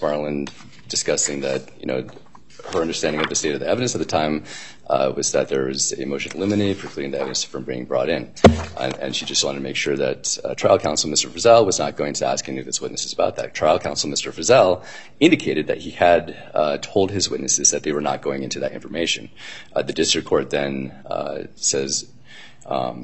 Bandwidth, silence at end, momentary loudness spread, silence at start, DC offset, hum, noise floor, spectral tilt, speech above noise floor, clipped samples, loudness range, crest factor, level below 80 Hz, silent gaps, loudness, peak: 8.8 kHz; 0 s; 11 LU; 0 s; 0.7%; none; -45 dBFS; -3 dB/octave; 24 dB; under 0.1%; 4 LU; 22 dB; -50 dBFS; none; -21 LUFS; 0 dBFS